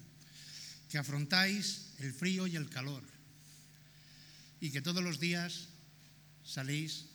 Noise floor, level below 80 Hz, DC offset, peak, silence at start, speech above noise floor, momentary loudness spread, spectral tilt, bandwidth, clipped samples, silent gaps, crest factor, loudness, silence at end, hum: -60 dBFS; -78 dBFS; under 0.1%; -14 dBFS; 0 s; 23 dB; 25 LU; -4 dB/octave; over 20 kHz; under 0.1%; none; 26 dB; -37 LUFS; 0 s; 50 Hz at -60 dBFS